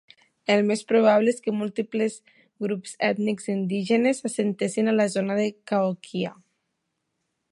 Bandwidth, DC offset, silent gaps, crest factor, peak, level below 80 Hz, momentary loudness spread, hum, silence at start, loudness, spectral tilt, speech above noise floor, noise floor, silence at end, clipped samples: 11.5 kHz; under 0.1%; none; 18 dB; -6 dBFS; -76 dBFS; 10 LU; none; 0.5 s; -24 LUFS; -5.5 dB/octave; 54 dB; -78 dBFS; 1.2 s; under 0.1%